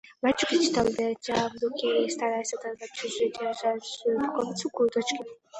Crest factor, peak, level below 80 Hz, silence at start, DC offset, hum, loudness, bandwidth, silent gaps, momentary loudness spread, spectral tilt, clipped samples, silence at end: 18 dB; -10 dBFS; -62 dBFS; 0.05 s; under 0.1%; none; -28 LUFS; 9 kHz; none; 9 LU; -3.5 dB/octave; under 0.1%; 0 s